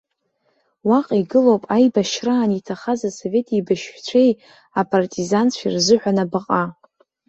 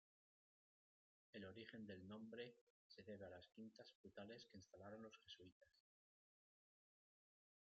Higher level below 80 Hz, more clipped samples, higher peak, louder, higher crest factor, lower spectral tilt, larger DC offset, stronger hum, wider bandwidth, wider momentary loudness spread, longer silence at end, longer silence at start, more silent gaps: first, -62 dBFS vs under -90 dBFS; neither; first, -2 dBFS vs -40 dBFS; first, -19 LUFS vs -61 LUFS; second, 16 dB vs 22 dB; about the same, -5 dB/octave vs -4 dB/octave; neither; neither; first, 8 kHz vs 7 kHz; about the same, 8 LU vs 7 LU; second, 0.55 s vs 1.85 s; second, 0.85 s vs 1.35 s; second, none vs 2.61-2.90 s, 3.95-4.04 s, 5.52-5.61 s